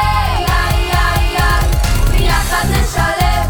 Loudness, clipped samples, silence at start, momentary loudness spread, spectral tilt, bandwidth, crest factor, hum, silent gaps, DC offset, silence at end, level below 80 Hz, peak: -14 LUFS; under 0.1%; 0 s; 1 LU; -4.5 dB/octave; over 20 kHz; 12 dB; none; none; under 0.1%; 0 s; -16 dBFS; 0 dBFS